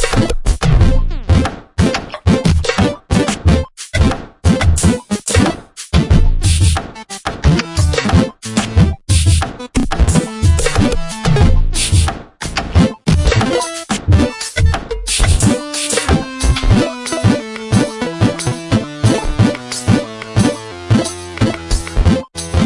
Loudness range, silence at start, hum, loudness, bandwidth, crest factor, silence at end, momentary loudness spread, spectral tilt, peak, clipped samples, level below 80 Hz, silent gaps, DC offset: 2 LU; 0 s; none; -15 LUFS; 11.5 kHz; 14 dB; 0 s; 7 LU; -5 dB/octave; 0 dBFS; under 0.1%; -20 dBFS; none; under 0.1%